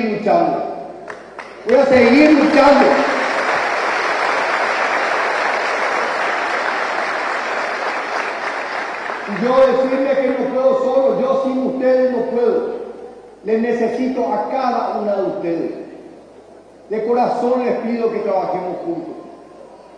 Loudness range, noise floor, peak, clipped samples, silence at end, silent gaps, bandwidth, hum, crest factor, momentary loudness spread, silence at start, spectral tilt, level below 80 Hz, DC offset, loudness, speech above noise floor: 7 LU; -42 dBFS; -2 dBFS; under 0.1%; 0 s; none; 10.5 kHz; none; 16 dB; 15 LU; 0 s; -5 dB/octave; -56 dBFS; under 0.1%; -17 LUFS; 27 dB